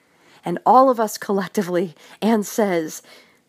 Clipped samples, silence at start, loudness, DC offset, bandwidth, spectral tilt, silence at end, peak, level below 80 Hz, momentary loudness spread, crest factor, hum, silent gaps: under 0.1%; 0.45 s; -20 LUFS; under 0.1%; 15.5 kHz; -5.5 dB/octave; 0.5 s; -2 dBFS; -78 dBFS; 16 LU; 18 dB; none; none